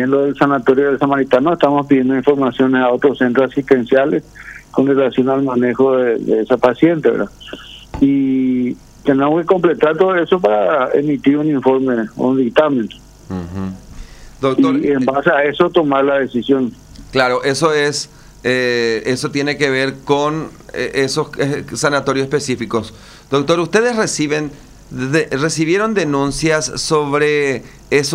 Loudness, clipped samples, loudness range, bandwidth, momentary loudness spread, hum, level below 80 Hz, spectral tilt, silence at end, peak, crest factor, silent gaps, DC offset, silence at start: -15 LUFS; under 0.1%; 4 LU; 13 kHz; 10 LU; none; -44 dBFS; -5 dB/octave; 0 s; 0 dBFS; 14 dB; none; under 0.1%; 0 s